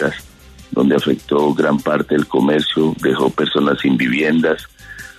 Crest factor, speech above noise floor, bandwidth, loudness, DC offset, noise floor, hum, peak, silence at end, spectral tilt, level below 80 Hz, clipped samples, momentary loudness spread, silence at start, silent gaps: 14 dB; 25 dB; 13.5 kHz; -16 LUFS; under 0.1%; -41 dBFS; none; -2 dBFS; 0.1 s; -6 dB/octave; -48 dBFS; under 0.1%; 8 LU; 0 s; none